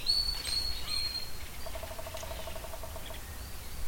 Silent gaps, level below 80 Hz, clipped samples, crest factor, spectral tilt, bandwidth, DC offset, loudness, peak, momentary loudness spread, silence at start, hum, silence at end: none; -44 dBFS; under 0.1%; 20 dB; -2 dB/octave; 17 kHz; under 0.1%; -36 LUFS; -16 dBFS; 13 LU; 0 s; none; 0 s